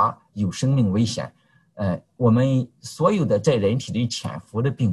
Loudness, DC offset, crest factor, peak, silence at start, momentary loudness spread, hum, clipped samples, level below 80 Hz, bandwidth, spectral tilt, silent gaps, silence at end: -22 LUFS; under 0.1%; 18 dB; -4 dBFS; 0 s; 10 LU; none; under 0.1%; -48 dBFS; 12 kHz; -7 dB/octave; none; 0 s